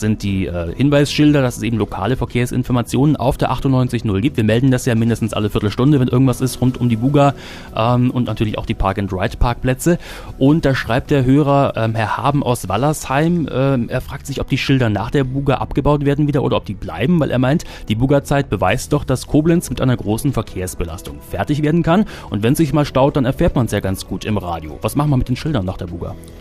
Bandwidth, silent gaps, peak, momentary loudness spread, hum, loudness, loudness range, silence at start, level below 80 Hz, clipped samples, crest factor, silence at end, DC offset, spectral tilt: 15.5 kHz; none; -4 dBFS; 8 LU; none; -17 LUFS; 2 LU; 0 s; -32 dBFS; under 0.1%; 14 dB; 0 s; under 0.1%; -6.5 dB/octave